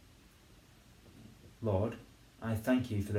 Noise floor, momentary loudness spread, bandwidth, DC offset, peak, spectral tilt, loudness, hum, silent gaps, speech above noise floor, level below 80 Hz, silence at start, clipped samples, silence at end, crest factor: -61 dBFS; 24 LU; 16.5 kHz; under 0.1%; -18 dBFS; -7.5 dB/octave; -35 LUFS; none; none; 27 dB; -64 dBFS; 1.05 s; under 0.1%; 0 s; 18 dB